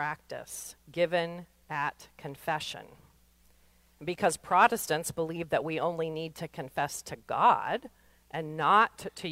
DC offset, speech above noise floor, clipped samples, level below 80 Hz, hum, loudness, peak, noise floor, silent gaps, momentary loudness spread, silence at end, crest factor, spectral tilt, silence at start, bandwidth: under 0.1%; 33 dB; under 0.1%; -66 dBFS; none; -30 LUFS; -8 dBFS; -64 dBFS; none; 17 LU; 0 s; 22 dB; -4 dB/octave; 0 s; 16 kHz